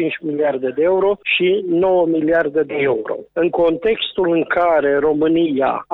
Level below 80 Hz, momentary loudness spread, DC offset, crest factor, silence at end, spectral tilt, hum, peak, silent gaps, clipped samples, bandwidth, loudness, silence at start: -52 dBFS; 4 LU; under 0.1%; 12 dB; 0 s; -8.5 dB/octave; none; -6 dBFS; none; under 0.1%; 4.1 kHz; -17 LUFS; 0 s